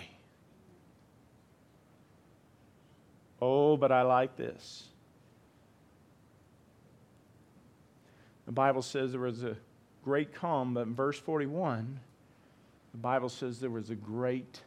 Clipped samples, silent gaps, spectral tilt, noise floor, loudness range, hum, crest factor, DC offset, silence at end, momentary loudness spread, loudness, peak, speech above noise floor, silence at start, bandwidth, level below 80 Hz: under 0.1%; none; -6.5 dB/octave; -63 dBFS; 6 LU; none; 22 dB; under 0.1%; 0.05 s; 20 LU; -32 LUFS; -14 dBFS; 31 dB; 0 s; 12.5 kHz; -76 dBFS